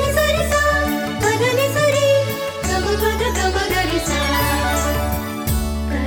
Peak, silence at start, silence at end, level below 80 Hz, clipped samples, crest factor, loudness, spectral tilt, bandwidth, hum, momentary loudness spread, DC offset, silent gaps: -6 dBFS; 0 s; 0 s; -26 dBFS; under 0.1%; 12 dB; -18 LUFS; -4 dB/octave; 18 kHz; none; 6 LU; under 0.1%; none